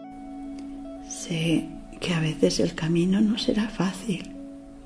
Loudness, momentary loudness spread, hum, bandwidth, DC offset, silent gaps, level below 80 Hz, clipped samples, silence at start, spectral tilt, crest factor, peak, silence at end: -26 LUFS; 16 LU; none; 11 kHz; under 0.1%; none; -48 dBFS; under 0.1%; 0 s; -5.5 dB/octave; 20 dB; -6 dBFS; 0 s